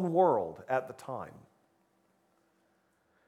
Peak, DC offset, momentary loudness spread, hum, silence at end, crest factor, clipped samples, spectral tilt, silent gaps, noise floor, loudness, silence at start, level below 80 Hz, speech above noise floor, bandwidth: -14 dBFS; under 0.1%; 16 LU; none; 1.9 s; 20 dB; under 0.1%; -8 dB/octave; none; -73 dBFS; -32 LUFS; 0 s; -78 dBFS; 42 dB; 13.5 kHz